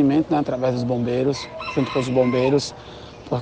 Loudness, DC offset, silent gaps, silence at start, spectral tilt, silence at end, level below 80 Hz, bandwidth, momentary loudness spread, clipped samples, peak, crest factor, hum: -22 LUFS; under 0.1%; none; 0 s; -6.5 dB/octave; 0 s; -50 dBFS; 9.4 kHz; 13 LU; under 0.1%; -6 dBFS; 16 dB; none